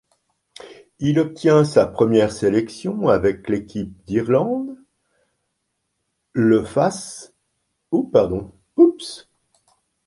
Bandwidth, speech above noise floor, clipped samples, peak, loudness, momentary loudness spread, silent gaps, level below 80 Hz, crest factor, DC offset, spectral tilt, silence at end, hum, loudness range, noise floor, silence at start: 11.5 kHz; 56 dB; under 0.1%; -2 dBFS; -19 LUFS; 15 LU; none; -50 dBFS; 18 dB; under 0.1%; -7 dB/octave; 0.9 s; none; 6 LU; -74 dBFS; 0.65 s